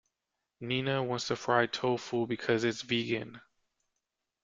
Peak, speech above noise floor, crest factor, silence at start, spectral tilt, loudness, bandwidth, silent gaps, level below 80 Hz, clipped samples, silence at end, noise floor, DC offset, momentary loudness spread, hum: -10 dBFS; 55 dB; 22 dB; 0.6 s; -5 dB/octave; -31 LUFS; 7.8 kHz; none; -70 dBFS; under 0.1%; 1.05 s; -86 dBFS; under 0.1%; 7 LU; none